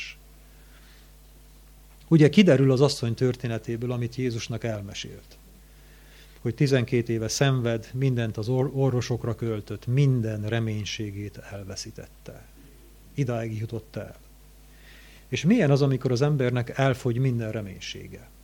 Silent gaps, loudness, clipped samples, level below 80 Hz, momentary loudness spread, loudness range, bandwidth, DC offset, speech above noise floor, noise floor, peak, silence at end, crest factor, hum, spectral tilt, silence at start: none; -25 LUFS; under 0.1%; -52 dBFS; 18 LU; 11 LU; 17.5 kHz; under 0.1%; 26 dB; -51 dBFS; -4 dBFS; 0.2 s; 22 dB; none; -6.5 dB/octave; 0 s